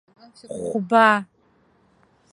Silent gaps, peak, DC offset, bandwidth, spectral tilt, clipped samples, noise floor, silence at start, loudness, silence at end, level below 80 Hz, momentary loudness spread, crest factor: none; -2 dBFS; under 0.1%; 11.5 kHz; -5 dB/octave; under 0.1%; -61 dBFS; 0.5 s; -19 LUFS; 1.1 s; -68 dBFS; 17 LU; 22 dB